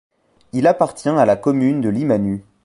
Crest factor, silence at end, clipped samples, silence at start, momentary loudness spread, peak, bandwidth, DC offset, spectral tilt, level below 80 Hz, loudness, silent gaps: 16 dB; 0.25 s; under 0.1%; 0.55 s; 4 LU; -2 dBFS; 11.5 kHz; under 0.1%; -7.5 dB/octave; -52 dBFS; -17 LUFS; none